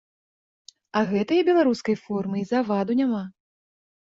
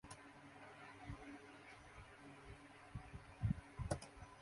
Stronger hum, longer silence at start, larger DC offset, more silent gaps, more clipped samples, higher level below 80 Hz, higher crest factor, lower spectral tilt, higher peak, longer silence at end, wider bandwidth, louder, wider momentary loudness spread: neither; first, 0.95 s vs 0.05 s; neither; neither; neither; second, -66 dBFS vs -60 dBFS; second, 16 dB vs 24 dB; about the same, -7 dB/octave vs -6 dB/octave; first, -8 dBFS vs -28 dBFS; first, 0.85 s vs 0 s; second, 7.8 kHz vs 11.5 kHz; first, -24 LUFS vs -52 LUFS; second, 8 LU vs 15 LU